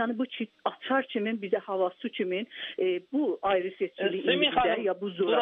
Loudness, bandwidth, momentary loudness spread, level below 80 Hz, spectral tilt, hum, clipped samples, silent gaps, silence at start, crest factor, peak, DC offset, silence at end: -29 LUFS; 4.2 kHz; 9 LU; -64 dBFS; -7.5 dB/octave; none; under 0.1%; none; 0 s; 18 dB; -12 dBFS; under 0.1%; 0 s